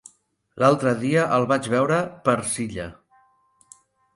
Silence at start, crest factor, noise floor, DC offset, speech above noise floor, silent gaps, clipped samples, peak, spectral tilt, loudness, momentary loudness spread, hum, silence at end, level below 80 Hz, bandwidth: 0.55 s; 20 dB; -63 dBFS; under 0.1%; 41 dB; none; under 0.1%; -4 dBFS; -5.5 dB/octave; -22 LUFS; 10 LU; none; 1.2 s; -56 dBFS; 11.5 kHz